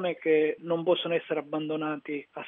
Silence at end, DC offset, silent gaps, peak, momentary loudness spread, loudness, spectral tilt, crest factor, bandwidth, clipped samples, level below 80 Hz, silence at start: 0 s; under 0.1%; none; -12 dBFS; 8 LU; -29 LUFS; -3.5 dB/octave; 16 dB; 3.9 kHz; under 0.1%; -86 dBFS; 0 s